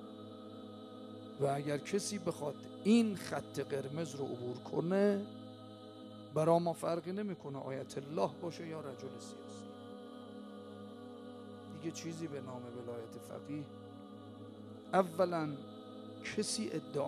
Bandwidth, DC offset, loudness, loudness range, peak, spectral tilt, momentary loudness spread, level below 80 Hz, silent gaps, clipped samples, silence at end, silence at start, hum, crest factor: 13.5 kHz; under 0.1%; -38 LUFS; 11 LU; -16 dBFS; -5.5 dB/octave; 18 LU; -80 dBFS; none; under 0.1%; 0 s; 0 s; none; 22 dB